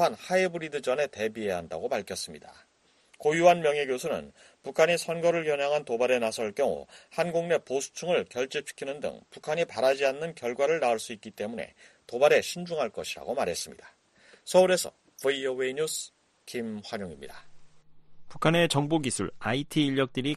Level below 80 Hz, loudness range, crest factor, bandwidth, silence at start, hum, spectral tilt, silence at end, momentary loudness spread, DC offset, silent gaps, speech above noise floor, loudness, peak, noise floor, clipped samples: -64 dBFS; 4 LU; 22 dB; 13 kHz; 0 s; none; -4 dB/octave; 0 s; 14 LU; under 0.1%; none; 35 dB; -28 LUFS; -8 dBFS; -63 dBFS; under 0.1%